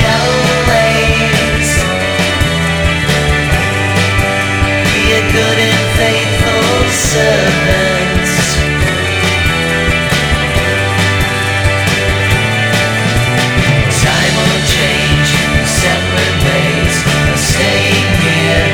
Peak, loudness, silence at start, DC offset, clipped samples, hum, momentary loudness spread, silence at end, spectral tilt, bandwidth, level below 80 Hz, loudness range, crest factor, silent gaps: 0 dBFS; -11 LUFS; 0 s; under 0.1%; under 0.1%; none; 2 LU; 0 s; -4 dB/octave; over 20 kHz; -22 dBFS; 1 LU; 10 dB; none